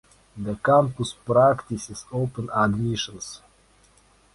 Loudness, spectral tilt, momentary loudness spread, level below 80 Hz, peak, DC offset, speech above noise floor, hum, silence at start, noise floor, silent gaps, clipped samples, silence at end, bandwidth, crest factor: -23 LUFS; -5.5 dB/octave; 16 LU; -52 dBFS; -6 dBFS; under 0.1%; 35 dB; none; 0.35 s; -58 dBFS; none; under 0.1%; 1 s; 11.5 kHz; 18 dB